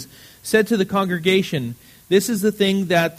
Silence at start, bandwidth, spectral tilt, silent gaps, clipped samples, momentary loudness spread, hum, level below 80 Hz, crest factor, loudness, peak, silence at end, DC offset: 0 s; 15.5 kHz; -5 dB/octave; none; under 0.1%; 15 LU; none; -58 dBFS; 18 dB; -19 LUFS; -2 dBFS; 0.05 s; under 0.1%